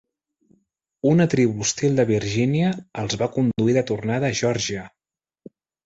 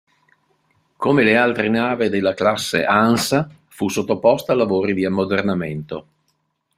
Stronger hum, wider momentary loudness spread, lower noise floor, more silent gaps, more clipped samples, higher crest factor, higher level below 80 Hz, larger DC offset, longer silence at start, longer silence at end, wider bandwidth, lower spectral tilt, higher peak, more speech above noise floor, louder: neither; second, 7 LU vs 10 LU; about the same, -70 dBFS vs -69 dBFS; neither; neither; about the same, 16 dB vs 20 dB; about the same, -54 dBFS vs -58 dBFS; neither; about the same, 1.05 s vs 1 s; first, 0.95 s vs 0.75 s; second, 8.2 kHz vs 16 kHz; about the same, -5.5 dB/octave vs -5 dB/octave; second, -6 dBFS vs 0 dBFS; about the same, 49 dB vs 51 dB; second, -21 LUFS vs -18 LUFS